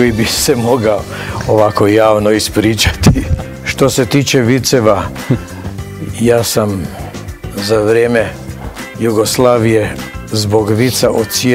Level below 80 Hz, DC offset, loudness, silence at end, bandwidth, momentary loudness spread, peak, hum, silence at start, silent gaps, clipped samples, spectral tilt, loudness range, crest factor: -30 dBFS; under 0.1%; -12 LUFS; 0 s; 16.5 kHz; 15 LU; 0 dBFS; none; 0 s; none; 0.6%; -5 dB/octave; 4 LU; 12 dB